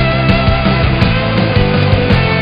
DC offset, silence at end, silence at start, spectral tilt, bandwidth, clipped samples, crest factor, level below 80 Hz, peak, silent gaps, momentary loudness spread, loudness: under 0.1%; 0 s; 0 s; -8.5 dB/octave; 5.6 kHz; 0.2%; 10 dB; -20 dBFS; 0 dBFS; none; 1 LU; -12 LUFS